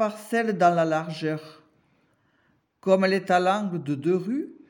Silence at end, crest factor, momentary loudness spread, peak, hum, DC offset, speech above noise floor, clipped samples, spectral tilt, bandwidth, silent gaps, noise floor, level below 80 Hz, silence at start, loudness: 0.15 s; 18 dB; 9 LU; -8 dBFS; none; under 0.1%; 44 dB; under 0.1%; -6.5 dB/octave; 17 kHz; none; -67 dBFS; -82 dBFS; 0 s; -24 LUFS